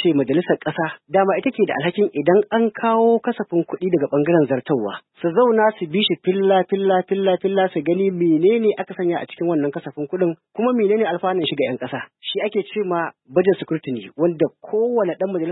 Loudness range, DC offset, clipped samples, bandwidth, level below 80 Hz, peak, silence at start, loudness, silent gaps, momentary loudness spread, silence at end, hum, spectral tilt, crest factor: 3 LU; under 0.1%; under 0.1%; 4.1 kHz; -68 dBFS; -2 dBFS; 0 s; -20 LUFS; none; 7 LU; 0 s; none; -11.5 dB/octave; 16 dB